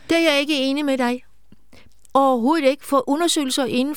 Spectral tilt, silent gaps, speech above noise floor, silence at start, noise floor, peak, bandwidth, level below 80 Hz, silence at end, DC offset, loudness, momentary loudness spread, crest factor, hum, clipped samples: -2.5 dB/octave; none; 34 dB; 0.1 s; -53 dBFS; -4 dBFS; 18.5 kHz; -62 dBFS; 0 s; 0.7%; -19 LUFS; 5 LU; 16 dB; none; under 0.1%